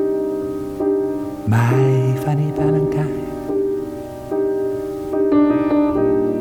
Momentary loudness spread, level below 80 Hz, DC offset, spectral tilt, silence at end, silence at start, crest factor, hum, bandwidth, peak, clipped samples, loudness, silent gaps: 10 LU; -44 dBFS; under 0.1%; -9 dB/octave; 0 s; 0 s; 14 dB; none; 18.5 kHz; -4 dBFS; under 0.1%; -19 LUFS; none